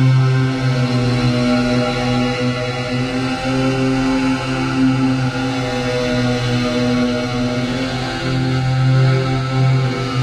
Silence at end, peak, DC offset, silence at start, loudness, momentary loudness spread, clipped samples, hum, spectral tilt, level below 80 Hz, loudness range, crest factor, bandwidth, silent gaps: 0 s; -4 dBFS; under 0.1%; 0 s; -17 LUFS; 4 LU; under 0.1%; none; -6.5 dB/octave; -36 dBFS; 1 LU; 12 dB; 10.5 kHz; none